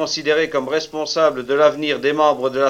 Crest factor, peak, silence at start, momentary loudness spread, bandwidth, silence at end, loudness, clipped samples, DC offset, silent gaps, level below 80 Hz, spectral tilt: 14 dB; -4 dBFS; 0 s; 6 LU; 12.5 kHz; 0 s; -18 LUFS; under 0.1%; under 0.1%; none; -58 dBFS; -3.5 dB/octave